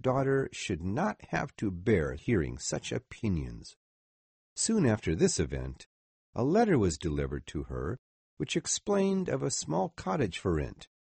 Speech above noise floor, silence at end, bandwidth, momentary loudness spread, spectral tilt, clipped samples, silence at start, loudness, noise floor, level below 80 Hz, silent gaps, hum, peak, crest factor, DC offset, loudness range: over 60 dB; 0.3 s; 8.8 kHz; 12 LU; -5 dB/octave; under 0.1%; 0.05 s; -31 LUFS; under -90 dBFS; -48 dBFS; 3.76-4.56 s, 5.86-6.33 s, 7.99-8.37 s; none; -12 dBFS; 18 dB; under 0.1%; 3 LU